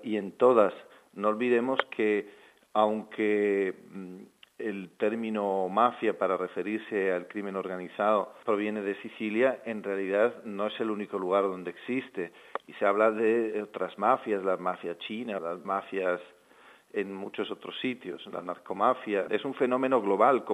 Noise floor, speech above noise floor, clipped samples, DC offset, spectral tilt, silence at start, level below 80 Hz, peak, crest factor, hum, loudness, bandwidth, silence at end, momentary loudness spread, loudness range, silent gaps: -57 dBFS; 28 dB; under 0.1%; under 0.1%; -6.5 dB/octave; 0 s; -84 dBFS; -8 dBFS; 20 dB; none; -29 LUFS; 11.5 kHz; 0 s; 13 LU; 5 LU; none